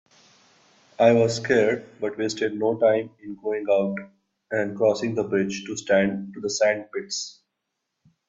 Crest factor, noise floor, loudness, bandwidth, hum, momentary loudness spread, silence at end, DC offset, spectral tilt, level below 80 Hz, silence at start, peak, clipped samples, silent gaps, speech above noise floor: 20 dB; -80 dBFS; -24 LUFS; 8 kHz; none; 10 LU; 0.95 s; under 0.1%; -4.5 dB/octave; -66 dBFS; 1 s; -4 dBFS; under 0.1%; none; 57 dB